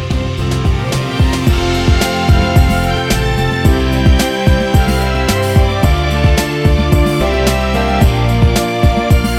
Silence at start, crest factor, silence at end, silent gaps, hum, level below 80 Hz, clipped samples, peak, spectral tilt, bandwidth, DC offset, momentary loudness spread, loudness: 0 s; 12 dB; 0 s; none; none; -16 dBFS; under 0.1%; 0 dBFS; -5.5 dB/octave; 16 kHz; under 0.1%; 3 LU; -13 LUFS